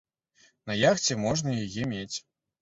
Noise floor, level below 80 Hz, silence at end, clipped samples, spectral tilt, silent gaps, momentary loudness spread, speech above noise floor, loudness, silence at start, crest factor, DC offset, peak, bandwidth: -64 dBFS; -58 dBFS; 0.4 s; under 0.1%; -4 dB/octave; none; 14 LU; 37 dB; -28 LUFS; 0.65 s; 20 dB; under 0.1%; -10 dBFS; 8 kHz